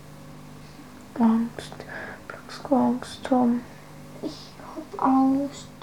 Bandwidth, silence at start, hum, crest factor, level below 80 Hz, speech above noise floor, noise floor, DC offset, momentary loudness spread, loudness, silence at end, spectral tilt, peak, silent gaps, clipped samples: 14.5 kHz; 0 s; 50 Hz at -55 dBFS; 18 dB; -58 dBFS; 21 dB; -45 dBFS; 0.2%; 22 LU; -25 LUFS; 0 s; -6 dB/octave; -8 dBFS; none; under 0.1%